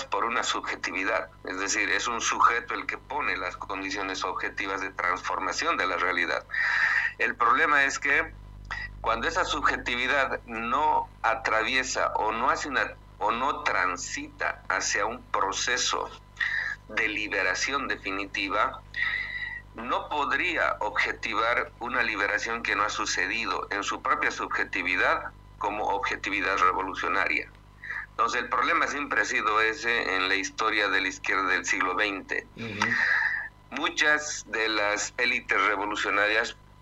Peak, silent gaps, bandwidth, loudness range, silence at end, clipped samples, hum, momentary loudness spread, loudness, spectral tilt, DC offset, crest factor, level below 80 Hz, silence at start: -8 dBFS; none; 15 kHz; 3 LU; 0.3 s; under 0.1%; 50 Hz at -50 dBFS; 8 LU; -26 LUFS; -1.5 dB/octave; under 0.1%; 18 dB; -52 dBFS; 0 s